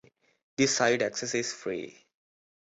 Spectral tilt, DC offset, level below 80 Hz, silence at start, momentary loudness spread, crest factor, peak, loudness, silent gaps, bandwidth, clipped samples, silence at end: -3 dB/octave; under 0.1%; -70 dBFS; 0.6 s; 15 LU; 20 dB; -12 dBFS; -28 LUFS; none; 8.4 kHz; under 0.1%; 0.8 s